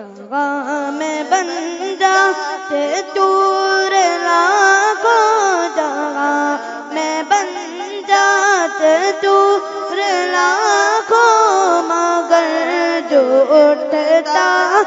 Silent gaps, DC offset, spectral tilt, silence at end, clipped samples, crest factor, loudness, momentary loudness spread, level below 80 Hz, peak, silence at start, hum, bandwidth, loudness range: none; under 0.1%; -1 dB/octave; 0 s; under 0.1%; 14 dB; -14 LUFS; 10 LU; -72 dBFS; 0 dBFS; 0 s; none; 7.8 kHz; 4 LU